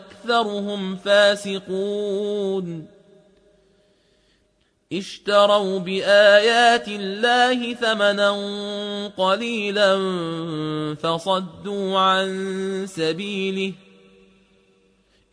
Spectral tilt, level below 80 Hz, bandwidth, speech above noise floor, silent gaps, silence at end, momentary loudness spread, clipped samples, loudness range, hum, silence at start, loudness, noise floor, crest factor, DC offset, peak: -4 dB/octave; -68 dBFS; 11 kHz; 44 dB; none; 1.6 s; 12 LU; under 0.1%; 10 LU; none; 0 s; -20 LUFS; -65 dBFS; 20 dB; under 0.1%; -2 dBFS